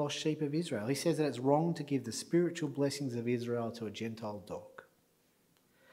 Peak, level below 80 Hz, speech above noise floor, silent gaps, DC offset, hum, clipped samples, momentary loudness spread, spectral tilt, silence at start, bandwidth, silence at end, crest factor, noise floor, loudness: -14 dBFS; -80 dBFS; 37 dB; none; under 0.1%; none; under 0.1%; 12 LU; -5.5 dB/octave; 0 s; 16 kHz; 1.1 s; 20 dB; -72 dBFS; -35 LUFS